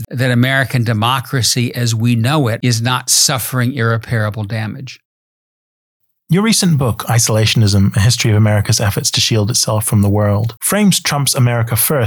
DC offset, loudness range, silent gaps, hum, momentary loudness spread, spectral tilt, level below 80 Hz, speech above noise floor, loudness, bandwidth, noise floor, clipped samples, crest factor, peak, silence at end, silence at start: under 0.1%; 5 LU; 5.05-6.00 s; none; 5 LU; -4 dB/octave; -46 dBFS; over 76 dB; -13 LUFS; 19.5 kHz; under -90 dBFS; under 0.1%; 14 dB; 0 dBFS; 0 s; 0 s